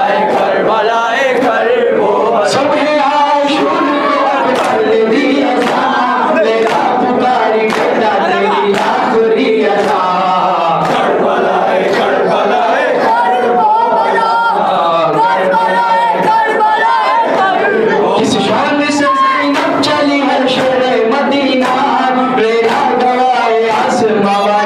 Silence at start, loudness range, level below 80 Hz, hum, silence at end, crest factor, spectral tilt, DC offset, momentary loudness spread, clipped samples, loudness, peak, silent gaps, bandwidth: 0 s; 1 LU; -54 dBFS; none; 0 s; 8 dB; -4.5 dB/octave; under 0.1%; 1 LU; under 0.1%; -11 LUFS; -2 dBFS; none; 13.5 kHz